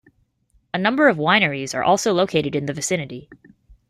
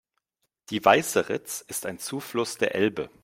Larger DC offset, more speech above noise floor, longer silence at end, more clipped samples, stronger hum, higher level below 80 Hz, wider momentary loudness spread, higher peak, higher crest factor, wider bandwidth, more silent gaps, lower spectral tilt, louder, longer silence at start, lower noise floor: neither; second, 43 dB vs 52 dB; first, 0.55 s vs 0.15 s; neither; neither; first, -58 dBFS vs -66 dBFS; about the same, 10 LU vs 12 LU; about the same, -2 dBFS vs -4 dBFS; about the same, 20 dB vs 24 dB; second, 14.5 kHz vs 16.5 kHz; neither; about the same, -4 dB/octave vs -3.5 dB/octave; first, -19 LUFS vs -26 LUFS; about the same, 0.75 s vs 0.7 s; second, -63 dBFS vs -78 dBFS